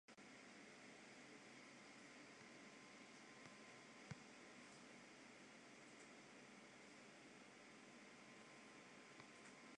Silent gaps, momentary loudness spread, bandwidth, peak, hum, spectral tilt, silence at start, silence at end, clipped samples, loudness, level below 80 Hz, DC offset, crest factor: none; 2 LU; 10.5 kHz; -42 dBFS; none; -3 dB/octave; 0.1 s; 0 s; under 0.1%; -62 LUFS; under -90 dBFS; under 0.1%; 22 dB